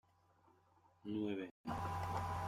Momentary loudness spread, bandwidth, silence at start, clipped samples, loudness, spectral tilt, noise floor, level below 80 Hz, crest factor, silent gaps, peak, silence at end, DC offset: 4 LU; 16 kHz; 1.05 s; under 0.1%; -44 LUFS; -7 dB/octave; -72 dBFS; -64 dBFS; 16 dB; 1.51-1.64 s; -28 dBFS; 0 s; under 0.1%